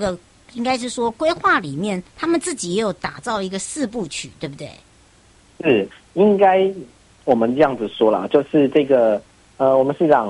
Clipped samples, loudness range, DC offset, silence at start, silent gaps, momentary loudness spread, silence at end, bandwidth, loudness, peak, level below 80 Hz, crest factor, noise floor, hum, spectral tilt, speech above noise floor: under 0.1%; 7 LU; under 0.1%; 0 s; none; 13 LU; 0 s; 11.5 kHz; -19 LUFS; -2 dBFS; -54 dBFS; 16 dB; -52 dBFS; none; -5 dB/octave; 33 dB